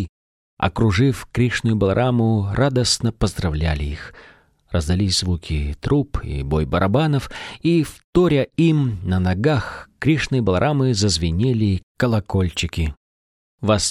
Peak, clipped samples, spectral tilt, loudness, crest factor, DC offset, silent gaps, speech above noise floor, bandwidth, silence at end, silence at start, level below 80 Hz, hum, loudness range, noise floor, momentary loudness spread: -4 dBFS; under 0.1%; -5.5 dB/octave; -20 LUFS; 16 dB; under 0.1%; 0.09-0.57 s, 8.04-8.13 s, 11.83-11.95 s, 12.97-13.58 s; over 71 dB; 14.5 kHz; 0 s; 0 s; -34 dBFS; none; 3 LU; under -90 dBFS; 8 LU